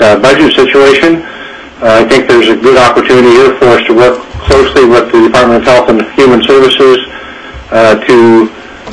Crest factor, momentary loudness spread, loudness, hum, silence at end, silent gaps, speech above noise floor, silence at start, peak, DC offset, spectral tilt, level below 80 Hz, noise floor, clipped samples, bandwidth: 6 dB; 11 LU; -5 LUFS; none; 0 s; none; 20 dB; 0 s; 0 dBFS; 0.5%; -5 dB/octave; -30 dBFS; -25 dBFS; 4%; 11 kHz